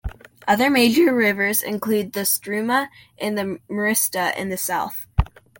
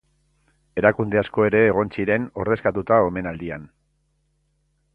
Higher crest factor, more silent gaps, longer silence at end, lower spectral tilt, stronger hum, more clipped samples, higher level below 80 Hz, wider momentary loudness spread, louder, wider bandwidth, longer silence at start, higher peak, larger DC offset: about the same, 18 dB vs 22 dB; neither; second, 0.35 s vs 1.3 s; second, -3.5 dB/octave vs -9.5 dB/octave; neither; neither; first, -36 dBFS vs -50 dBFS; second, 11 LU vs 14 LU; about the same, -20 LUFS vs -21 LUFS; first, 17 kHz vs 4.6 kHz; second, 0.05 s vs 0.75 s; second, -4 dBFS vs 0 dBFS; neither